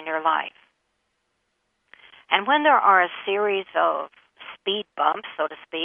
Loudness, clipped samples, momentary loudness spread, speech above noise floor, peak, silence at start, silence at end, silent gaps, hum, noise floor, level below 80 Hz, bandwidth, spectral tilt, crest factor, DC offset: -22 LUFS; under 0.1%; 14 LU; 52 dB; -2 dBFS; 0 s; 0 s; none; none; -74 dBFS; -78 dBFS; 3.8 kHz; -6 dB/octave; 22 dB; under 0.1%